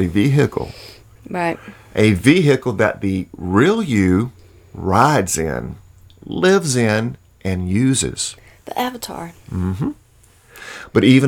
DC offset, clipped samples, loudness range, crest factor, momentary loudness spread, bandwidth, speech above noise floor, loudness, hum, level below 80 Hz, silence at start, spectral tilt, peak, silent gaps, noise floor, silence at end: under 0.1%; under 0.1%; 6 LU; 18 dB; 16 LU; 18 kHz; 34 dB; -18 LUFS; none; -44 dBFS; 0 s; -5.5 dB/octave; 0 dBFS; none; -51 dBFS; 0 s